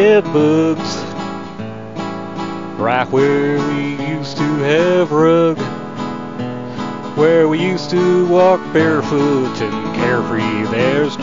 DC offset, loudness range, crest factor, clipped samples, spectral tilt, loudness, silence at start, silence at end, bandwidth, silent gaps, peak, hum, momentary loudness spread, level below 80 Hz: 1%; 4 LU; 14 dB; under 0.1%; -6.5 dB/octave; -16 LUFS; 0 s; 0 s; 7.6 kHz; none; 0 dBFS; none; 13 LU; -52 dBFS